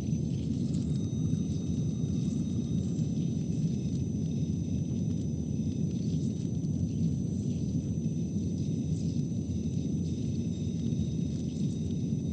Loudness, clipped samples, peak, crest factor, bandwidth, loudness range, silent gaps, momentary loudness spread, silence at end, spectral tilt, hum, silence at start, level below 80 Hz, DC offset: -32 LUFS; under 0.1%; -18 dBFS; 14 dB; 8.8 kHz; 1 LU; none; 2 LU; 0 s; -8 dB/octave; none; 0 s; -48 dBFS; under 0.1%